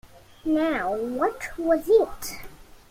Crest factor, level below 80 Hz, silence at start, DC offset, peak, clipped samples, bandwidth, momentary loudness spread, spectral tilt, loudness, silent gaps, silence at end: 18 dB; -50 dBFS; 0.15 s; under 0.1%; -8 dBFS; under 0.1%; 16.5 kHz; 15 LU; -4.5 dB/octave; -24 LUFS; none; 0.3 s